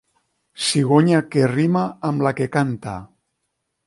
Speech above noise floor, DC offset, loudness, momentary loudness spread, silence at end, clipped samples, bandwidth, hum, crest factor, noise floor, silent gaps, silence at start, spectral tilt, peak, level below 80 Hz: 57 dB; under 0.1%; -19 LUFS; 11 LU; 0.8 s; under 0.1%; 11.5 kHz; none; 18 dB; -75 dBFS; none; 0.6 s; -6 dB/octave; -2 dBFS; -56 dBFS